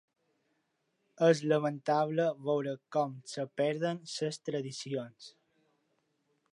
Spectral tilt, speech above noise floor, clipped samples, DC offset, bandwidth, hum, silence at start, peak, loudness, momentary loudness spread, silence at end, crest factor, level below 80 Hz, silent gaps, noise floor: -5.5 dB/octave; 47 dB; under 0.1%; under 0.1%; 11 kHz; none; 1.2 s; -14 dBFS; -33 LUFS; 11 LU; 1.25 s; 20 dB; -86 dBFS; none; -79 dBFS